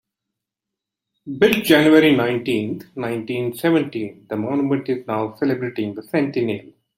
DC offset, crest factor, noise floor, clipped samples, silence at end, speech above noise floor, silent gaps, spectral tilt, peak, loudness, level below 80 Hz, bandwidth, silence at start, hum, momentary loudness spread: under 0.1%; 18 dB; -85 dBFS; under 0.1%; 0.35 s; 65 dB; none; -6 dB/octave; -2 dBFS; -20 LUFS; -60 dBFS; 16.5 kHz; 1.25 s; none; 14 LU